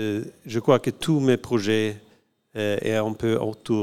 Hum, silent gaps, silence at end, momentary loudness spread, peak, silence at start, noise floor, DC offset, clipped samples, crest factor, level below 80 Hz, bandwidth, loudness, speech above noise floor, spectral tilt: none; none; 0 s; 9 LU; -4 dBFS; 0 s; -59 dBFS; 0.3%; under 0.1%; 20 dB; -58 dBFS; 15.5 kHz; -24 LUFS; 36 dB; -6 dB/octave